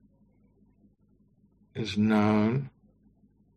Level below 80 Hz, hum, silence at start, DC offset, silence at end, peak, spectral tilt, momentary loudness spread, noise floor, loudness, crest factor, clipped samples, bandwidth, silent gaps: -64 dBFS; none; 1.75 s; under 0.1%; 0.9 s; -10 dBFS; -7.5 dB/octave; 18 LU; -65 dBFS; -27 LUFS; 20 dB; under 0.1%; 8.6 kHz; none